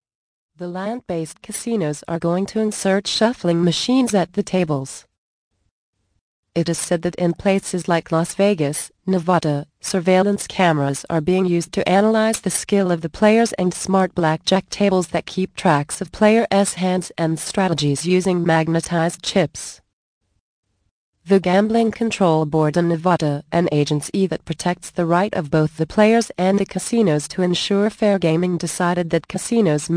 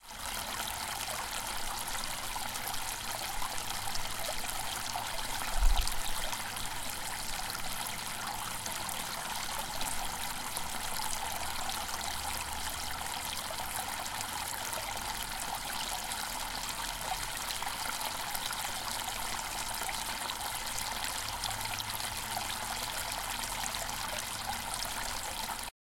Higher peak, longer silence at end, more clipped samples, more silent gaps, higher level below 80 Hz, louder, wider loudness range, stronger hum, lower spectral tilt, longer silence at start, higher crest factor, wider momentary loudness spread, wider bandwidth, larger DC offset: first, -2 dBFS vs -12 dBFS; second, 0 s vs 0.25 s; neither; first, 5.18-5.51 s, 5.71-5.93 s, 6.21-6.43 s, 19.93-20.21 s, 20.40-20.63 s, 20.91-21.13 s vs none; second, -52 dBFS vs -44 dBFS; first, -19 LUFS vs -35 LUFS; first, 4 LU vs 1 LU; neither; first, -5.5 dB/octave vs -1 dB/octave; first, 0.6 s vs 0 s; about the same, 18 dB vs 22 dB; first, 7 LU vs 2 LU; second, 10.5 kHz vs 17 kHz; neither